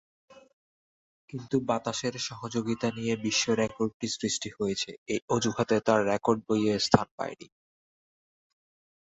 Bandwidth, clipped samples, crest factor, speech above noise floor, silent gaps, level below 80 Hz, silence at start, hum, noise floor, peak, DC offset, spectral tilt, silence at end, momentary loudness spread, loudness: 8.2 kHz; under 0.1%; 28 dB; over 61 dB; 0.53-1.28 s, 3.94-4.00 s, 4.98-5.06 s, 5.22-5.28 s, 7.11-7.18 s; -58 dBFS; 0.3 s; none; under -90 dBFS; -4 dBFS; under 0.1%; -4.5 dB/octave; 1.75 s; 10 LU; -29 LUFS